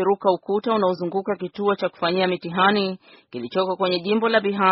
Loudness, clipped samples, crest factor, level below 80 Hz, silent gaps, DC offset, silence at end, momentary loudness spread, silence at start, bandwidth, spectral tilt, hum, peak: -22 LUFS; under 0.1%; 18 dB; -66 dBFS; none; under 0.1%; 0 s; 9 LU; 0 s; 5.8 kHz; -3.5 dB/octave; none; -4 dBFS